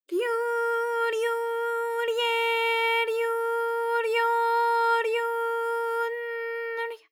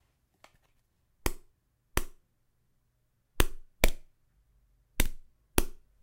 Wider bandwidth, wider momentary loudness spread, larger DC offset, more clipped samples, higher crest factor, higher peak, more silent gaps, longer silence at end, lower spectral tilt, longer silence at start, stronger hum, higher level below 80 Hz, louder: about the same, 16.5 kHz vs 16 kHz; second, 7 LU vs 16 LU; neither; neither; second, 14 dB vs 30 dB; second, -14 dBFS vs -4 dBFS; neither; second, 0.15 s vs 0.3 s; second, 1 dB/octave vs -3.5 dB/octave; second, 0.1 s vs 1.25 s; neither; second, under -90 dBFS vs -36 dBFS; first, -26 LUFS vs -34 LUFS